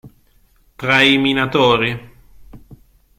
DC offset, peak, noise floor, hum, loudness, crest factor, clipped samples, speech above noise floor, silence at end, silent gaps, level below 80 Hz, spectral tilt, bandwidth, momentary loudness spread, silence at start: under 0.1%; 0 dBFS; -54 dBFS; none; -14 LUFS; 18 dB; under 0.1%; 39 dB; 0.45 s; none; -46 dBFS; -5 dB/octave; 16 kHz; 12 LU; 0.05 s